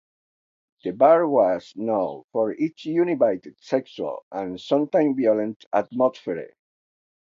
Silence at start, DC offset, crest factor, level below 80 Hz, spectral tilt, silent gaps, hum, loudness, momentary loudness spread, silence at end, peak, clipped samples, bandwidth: 0.85 s; under 0.1%; 18 dB; -70 dBFS; -7.5 dB/octave; 2.24-2.28 s, 4.23-4.31 s, 5.56-5.60 s, 5.66-5.71 s; none; -23 LUFS; 14 LU; 0.75 s; -4 dBFS; under 0.1%; 7.4 kHz